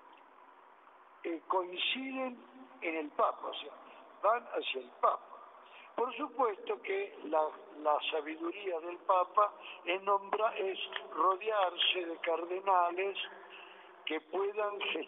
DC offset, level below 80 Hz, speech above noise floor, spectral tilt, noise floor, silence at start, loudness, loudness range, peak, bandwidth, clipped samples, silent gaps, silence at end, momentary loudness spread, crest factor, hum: under 0.1%; under -90 dBFS; 25 dB; 1.5 dB/octave; -60 dBFS; 0.1 s; -34 LUFS; 4 LU; -14 dBFS; 4 kHz; under 0.1%; none; 0 s; 14 LU; 20 dB; none